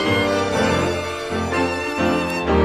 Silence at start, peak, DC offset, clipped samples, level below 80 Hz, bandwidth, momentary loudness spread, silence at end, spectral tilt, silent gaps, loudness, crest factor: 0 s; -4 dBFS; 0.2%; under 0.1%; -36 dBFS; 15.5 kHz; 5 LU; 0 s; -5 dB/octave; none; -20 LUFS; 16 dB